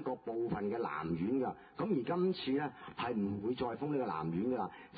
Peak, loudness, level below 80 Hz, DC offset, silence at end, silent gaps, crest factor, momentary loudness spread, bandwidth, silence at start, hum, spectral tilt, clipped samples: -22 dBFS; -37 LUFS; -66 dBFS; under 0.1%; 0 s; none; 14 dB; 5 LU; 4.8 kHz; 0 s; none; -6 dB/octave; under 0.1%